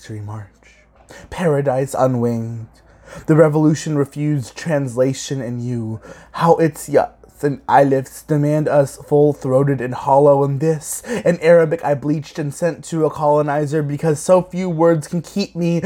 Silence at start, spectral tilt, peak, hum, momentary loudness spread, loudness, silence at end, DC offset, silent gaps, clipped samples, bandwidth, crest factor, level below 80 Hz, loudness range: 0.05 s; -7 dB/octave; 0 dBFS; none; 11 LU; -17 LUFS; 0 s; under 0.1%; none; under 0.1%; 16 kHz; 16 dB; -52 dBFS; 4 LU